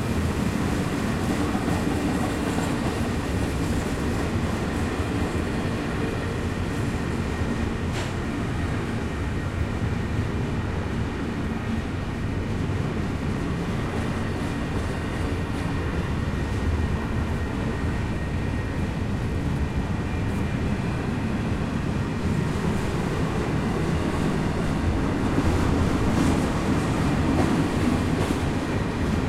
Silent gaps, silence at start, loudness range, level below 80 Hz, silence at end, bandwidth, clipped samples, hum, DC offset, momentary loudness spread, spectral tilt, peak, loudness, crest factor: none; 0 s; 4 LU; -34 dBFS; 0 s; 15 kHz; under 0.1%; none; under 0.1%; 5 LU; -6.5 dB/octave; -8 dBFS; -26 LUFS; 16 dB